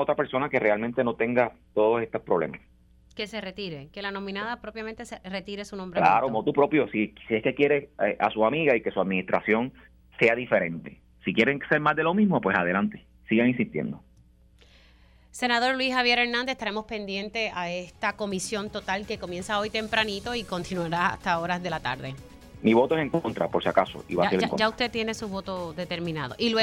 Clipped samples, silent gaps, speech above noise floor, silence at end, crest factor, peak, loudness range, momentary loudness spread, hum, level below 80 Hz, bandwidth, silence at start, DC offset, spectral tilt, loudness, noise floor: under 0.1%; none; 31 dB; 0 s; 22 dB; -6 dBFS; 5 LU; 12 LU; none; -56 dBFS; 14 kHz; 0 s; under 0.1%; -5 dB/octave; -26 LUFS; -57 dBFS